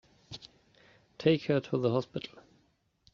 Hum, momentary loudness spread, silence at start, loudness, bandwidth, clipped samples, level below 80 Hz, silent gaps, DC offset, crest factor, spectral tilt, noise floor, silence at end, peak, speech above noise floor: none; 19 LU; 0.3 s; -31 LUFS; 7.2 kHz; under 0.1%; -68 dBFS; none; under 0.1%; 22 dB; -6 dB/octave; -72 dBFS; 0.85 s; -12 dBFS; 42 dB